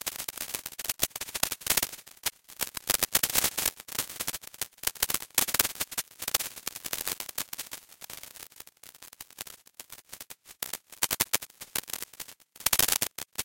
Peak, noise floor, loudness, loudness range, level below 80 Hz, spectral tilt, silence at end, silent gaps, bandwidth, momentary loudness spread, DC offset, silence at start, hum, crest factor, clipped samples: 0 dBFS; -52 dBFS; -29 LUFS; 11 LU; -58 dBFS; 0 dB/octave; 0 s; none; 17.5 kHz; 20 LU; under 0.1%; 0.05 s; none; 34 dB; under 0.1%